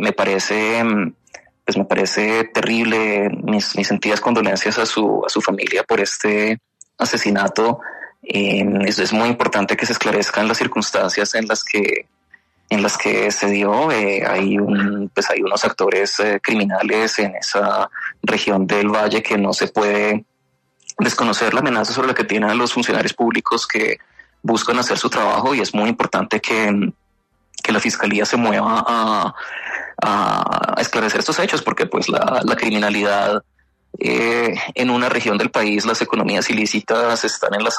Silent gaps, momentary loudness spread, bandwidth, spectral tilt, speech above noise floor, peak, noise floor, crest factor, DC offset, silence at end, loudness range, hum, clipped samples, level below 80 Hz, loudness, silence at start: none; 4 LU; 13.5 kHz; -4 dB/octave; 48 dB; -4 dBFS; -66 dBFS; 14 dB; under 0.1%; 0 s; 1 LU; none; under 0.1%; -60 dBFS; -18 LUFS; 0 s